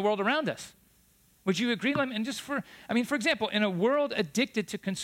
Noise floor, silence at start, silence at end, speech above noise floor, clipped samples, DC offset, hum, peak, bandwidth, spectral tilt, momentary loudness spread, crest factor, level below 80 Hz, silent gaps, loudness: -64 dBFS; 0 s; 0 s; 35 dB; under 0.1%; under 0.1%; none; -14 dBFS; 16.5 kHz; -4.5 dB/octave; 9 LU; 16 dB; -70 dBFS; none; -29 LUFS